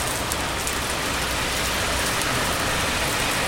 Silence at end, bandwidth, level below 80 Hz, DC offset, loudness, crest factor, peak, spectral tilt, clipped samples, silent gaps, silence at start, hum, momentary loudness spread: 0 s; 16.5 kHz; -36 dBFS; under 0.1%; -23 LUFS; 22 dB; -2 dBFS; -2 dB/octave; under 0.1%; none; 0 s; none; 2 LU